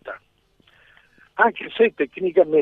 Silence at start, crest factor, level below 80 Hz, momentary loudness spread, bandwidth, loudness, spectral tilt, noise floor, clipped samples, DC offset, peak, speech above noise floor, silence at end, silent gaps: 0.05 s; 20 dB; -66 dBFS; 18 LU; 4.1 kHz; -20 LUFS; -7.5 dB/octave; -61 dBFS; under 0.1%; under 0.1%; -2 dBFS; 42 dB; 0 s; none